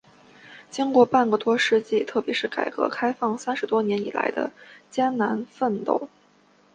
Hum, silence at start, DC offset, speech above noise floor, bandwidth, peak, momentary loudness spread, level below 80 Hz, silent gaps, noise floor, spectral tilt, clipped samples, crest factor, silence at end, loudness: none; 0.45 s; under 0.1%; 35 dB; 9.6 kHz; -4 dBFS; 9 LU; -72 dBFS; none; -59 dBFS; -5 dB/octave; under 0.1%; 20 dB; 0.7 s; -24 LUFS